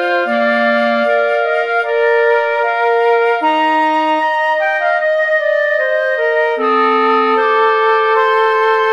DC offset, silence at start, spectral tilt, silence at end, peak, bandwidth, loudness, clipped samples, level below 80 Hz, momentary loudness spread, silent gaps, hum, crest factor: 0.2%; 0 s; -4 dB/octave; 0 s; -2 dBFS; 9.8 kHz; -13 LUFS; under 0.1%; -72 dBFS; 2 LU; none; none; 12 dB